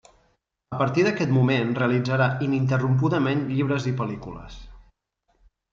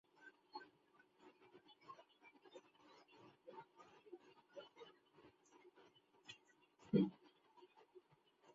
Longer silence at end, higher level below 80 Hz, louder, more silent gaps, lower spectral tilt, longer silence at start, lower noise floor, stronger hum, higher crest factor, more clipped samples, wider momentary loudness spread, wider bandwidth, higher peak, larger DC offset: first, 0.9 s vs 0.55 s; first, -52 dBFS vs -88 dBFS; first, -23 LUFS vs -47 LUFS; neither; about the same, -7.5 dB/octave vs -7 dB/octave; first, 0.7 s vs 0.25 s; second, -71 dBFS vs -75 dBFS; neither; second, 16 dB vs 28 dB; neither; second, 15 LU vs 26 LU; about the same, 7.4 kHz vs 7.4 kHz; first, -8 dBFS vs -24 dBFS; neither